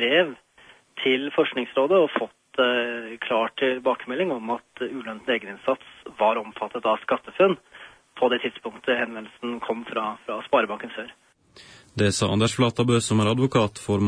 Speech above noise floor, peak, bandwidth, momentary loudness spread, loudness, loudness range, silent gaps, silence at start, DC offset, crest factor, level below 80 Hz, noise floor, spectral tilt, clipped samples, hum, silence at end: 30 dB; -6 dBFS; 10.5 kHz; 11 LU; -24 LUFS; 4 LU; none; 0 s; under 0.1%; 20 dB; -62 dBFS; -54 dBFS; -5 dB/octave; under 0.1%; none; 0 s